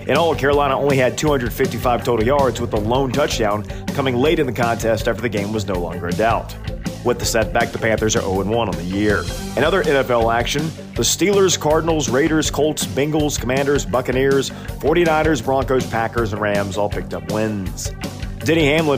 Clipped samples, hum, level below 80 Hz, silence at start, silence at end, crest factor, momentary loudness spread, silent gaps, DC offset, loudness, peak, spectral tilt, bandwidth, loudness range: under 0.1%; none; -34 dBFS; 0 s; 0 s; 14 dB; 8 LU; none; under 0.1%; -19 LUFS; -4 dBFS; -4.5 dB/octave; 16 kHz; 3 LU